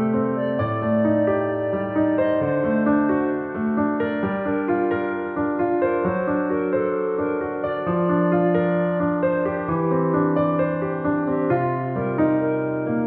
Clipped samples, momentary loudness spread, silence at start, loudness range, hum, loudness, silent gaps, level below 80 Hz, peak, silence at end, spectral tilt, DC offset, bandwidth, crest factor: under 0.1%; 5 LU; 0 s; 2 LU; none; -22 LUFS; none; -54 dBFS; -8 dBFS; 0 s; -8 dB/octave; under 0.1%; 4 kHz; 14 dB